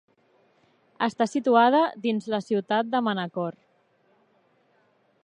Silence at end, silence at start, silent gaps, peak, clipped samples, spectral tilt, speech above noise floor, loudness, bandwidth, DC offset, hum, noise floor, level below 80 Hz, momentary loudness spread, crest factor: 1.7 s; 1 s; none; -6 dBFS; under 0.1%; -6 dB/octave; 42 dB; -24 LUFS; 10 kHz; under 0.1%; none; -65 dBFS; -80 dBFS; 11 LU; 20 dB